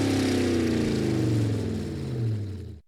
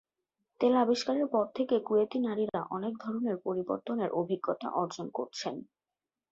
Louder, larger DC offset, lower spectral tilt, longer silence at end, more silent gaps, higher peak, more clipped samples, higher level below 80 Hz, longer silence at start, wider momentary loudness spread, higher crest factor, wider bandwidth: first, -27 LUFS vs -32 LUFS; neither; about the same, -6.5 dB/octave vs -6 dB/octave; second, 0.1 s vs 0.7 s; neither; about the same, -14 dBFS vs -14 dBFS; neither; first, -46 dBFS vs -76 dBFS; second, 0 s vs 0.6 s; about the same, 8 LU vs 9 LU; second, 12 dB vs 18 dB; first, 15 kHz vs 8 kHz